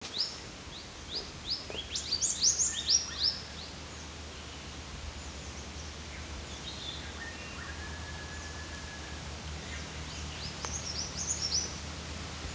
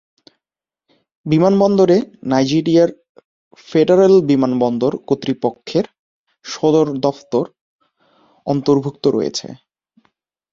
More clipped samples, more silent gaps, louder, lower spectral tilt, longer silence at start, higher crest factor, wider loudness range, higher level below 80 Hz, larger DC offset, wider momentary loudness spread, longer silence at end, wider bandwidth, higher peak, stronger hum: neither; second, none vs 3.09-3.15 s, 3.25-3.51 s, 5.99-6.26 s, 7.61-7.79 s; second, -34 LUFS vs -16 LUFS; second, -1.5 dB/octave vs -6.5 dB/octave; second, 0 s vs 1.25 s; first, 24 dB vs 16 dB; first, 12 LU vs 6 LU; first, -48 dBFS vs -58 dBFS; neither; about the same, 16 LU vs 14 LU; second, 0 s vs 0.95 s; about the same, 8 kHz vs 7.6 kHz; second, -14 dBFS vs -2 dBFS; neither